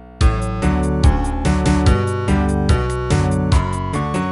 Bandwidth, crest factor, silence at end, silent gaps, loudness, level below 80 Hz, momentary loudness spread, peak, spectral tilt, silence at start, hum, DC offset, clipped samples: 11.5 kHz; 16 dB; 0 s; none; -18 LUFS; -20 dBFS; 4 LU; 0 dBFS; -6.5 dB/octave; 0 s; none; under 0.1%; under 0.1%